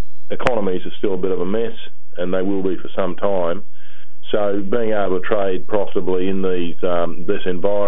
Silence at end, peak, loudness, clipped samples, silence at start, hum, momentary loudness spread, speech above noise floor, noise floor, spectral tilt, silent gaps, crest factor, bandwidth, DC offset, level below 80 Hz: 0 s; 0 dBFS; -22 LUFS; under 0.1%; 0 s; none; 5 LU; 31 dB; -51 dBFS; -8 dB/octave; none; 22 dB; 9.2 kHz; 20%; -50 dBFS